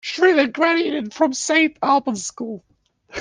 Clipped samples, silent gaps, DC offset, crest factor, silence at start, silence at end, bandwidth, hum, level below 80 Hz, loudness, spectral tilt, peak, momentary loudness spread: under 0.1%; none; under 0.1%; 16 dB; 0.05 s; 0 s; 10 kHz; none; -62 dBFS; -19 LUFS; -2.5 dB/octave; -4 dBFS; 15 LU